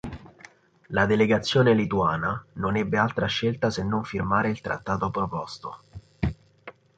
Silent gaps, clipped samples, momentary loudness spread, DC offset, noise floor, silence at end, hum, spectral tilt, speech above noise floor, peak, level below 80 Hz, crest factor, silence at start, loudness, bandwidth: none; under 0.1%; 16 LU; under 0.1%; -52 dBFS; 0.25 s; none; -6.5 dB/octave; 28 dB; -6 dBFS; -46 dBFS; 20 dB; 0.05 s; -25 LUFS; 9 kHz